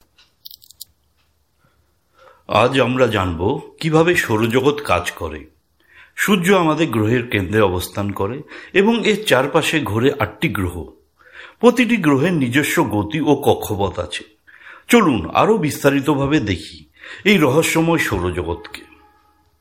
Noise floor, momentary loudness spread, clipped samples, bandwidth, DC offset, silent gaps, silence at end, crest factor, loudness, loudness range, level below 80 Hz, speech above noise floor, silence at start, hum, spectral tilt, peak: -63 dBFS; 13 LU; under 0.1%; 16.5 kHz; under 0.1%; none; 0.8 s; 18 dB; -17 LUFS; 2 LU; -48 dBFS; 46 dB; 2.5 s; none; -5.5 dB/octave; 0 dBFS